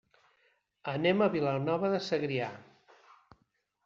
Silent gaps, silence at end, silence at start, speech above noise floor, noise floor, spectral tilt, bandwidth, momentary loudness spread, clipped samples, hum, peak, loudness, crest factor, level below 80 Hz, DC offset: none; 1.25 s; 0.85 s; 46 dB; -76 dBFS; -5 dB/octave; 7.4 kHz; 13 LU; under 0.1%; none; -14 dBFS; -31 LUFS; 18 dB; -72 dBFS; under 0.1%